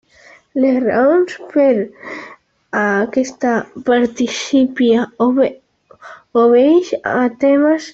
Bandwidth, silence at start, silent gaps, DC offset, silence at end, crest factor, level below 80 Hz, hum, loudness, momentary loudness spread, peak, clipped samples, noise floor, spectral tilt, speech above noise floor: 7.8 kHz; 0.55 s; none; under 0.1%; 0.05 s; 12 dB; -58 dBFS; none; -15 LUFS; 8 LU; -2 dBFS; under 0.1%; -46 dBFS; -5 dB/octave; 32 dB